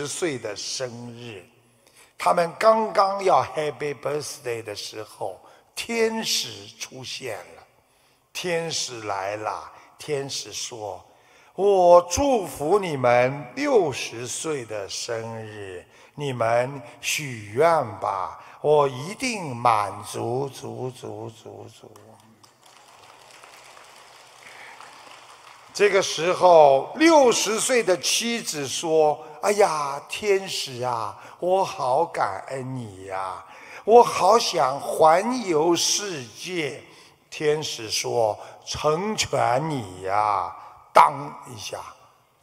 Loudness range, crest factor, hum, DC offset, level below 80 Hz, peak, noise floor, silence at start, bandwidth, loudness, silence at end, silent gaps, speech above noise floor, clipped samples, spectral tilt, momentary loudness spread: 10 LU; 22 dB; none; under 0.1%; -58 dBFS; -2 dBFS; -62 dBFS; 0 s; 16 kHz; -23 LUFS; 0.5 s; none; 39 dB; under 0.1%; -3.5 dB/octave; 19 LU